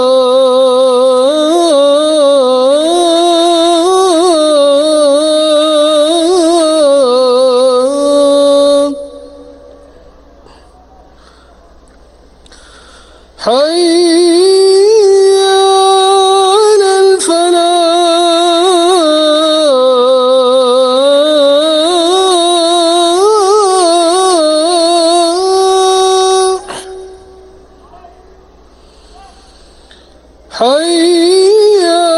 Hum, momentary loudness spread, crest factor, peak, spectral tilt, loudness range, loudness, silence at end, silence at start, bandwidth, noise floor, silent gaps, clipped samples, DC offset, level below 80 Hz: none; 3 LU; 8 dB; 0 dBFS; -1.5 dB/octave; 7 LU; -8 LUFS; 0 s; 0 s; 13.5 kHz; -40 dBFS; none; under 0.1%; under 0.1%; -48 dBFS